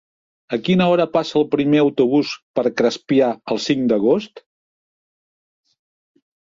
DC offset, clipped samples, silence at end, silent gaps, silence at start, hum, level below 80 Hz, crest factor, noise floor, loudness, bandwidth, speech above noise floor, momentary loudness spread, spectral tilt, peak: under 0.1%; under 0.1%; 2.2 s; 2.42-2.54 s; 0.5 s; none; -62 dBFS; 16 dB; under -90 dBFS; -18 LUFS; 7.6 kHz; over 73 dB; 8 LU; -6.5 dB/octave; -4 dBFS